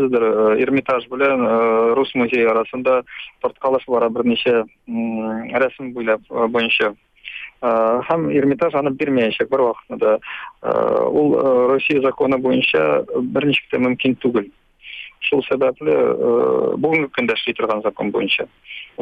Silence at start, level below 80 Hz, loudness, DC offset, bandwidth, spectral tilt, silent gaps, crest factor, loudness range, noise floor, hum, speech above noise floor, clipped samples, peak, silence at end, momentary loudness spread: 0 s; -58 dBFS; -18 LUFS; under 0.1%; 5.2 kHz; -7.5 dB/octave; none; 14 dB; 3 LU; -37 dBFS; none; 19 dB; under 0.1%; -4 dBFS; 0 s; 9 LU